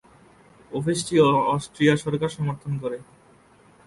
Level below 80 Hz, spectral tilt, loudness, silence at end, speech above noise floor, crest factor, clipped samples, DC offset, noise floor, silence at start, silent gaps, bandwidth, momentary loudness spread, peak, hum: -58 dBFS; -6 dB/octave; -23 LUFS; 0.85 s; 32 dB; 18 dB; under 0.1%; under 0.1%; -55 dBFS; 0.7 s; none; 11.5 kHz; 13 LU; -6 dBFS; none